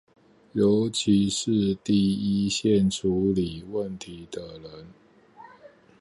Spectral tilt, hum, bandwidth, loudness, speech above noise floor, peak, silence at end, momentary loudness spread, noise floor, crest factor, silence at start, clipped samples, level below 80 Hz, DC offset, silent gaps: -5.5 dB/octave; none; 11.5 kHz; -24 LUFS; 28 dB; -10 dBFS; 0.35 s; 16 LU; -52 dBFS; 16 dB; 0.55 s; under 0.1%; -52 dBFS; under 0.1%; none